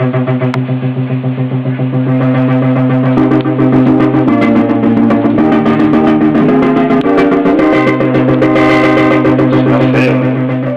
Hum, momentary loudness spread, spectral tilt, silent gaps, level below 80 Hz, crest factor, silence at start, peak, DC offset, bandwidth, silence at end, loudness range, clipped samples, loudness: none; 6 LU; -9 dB/octave; none; -40 dBFS; 6 dB; 0 s; -2 dBFS; under 0.1%; 7 kHz; 0 s; 3 LU; under 0.1%; -10 LUFS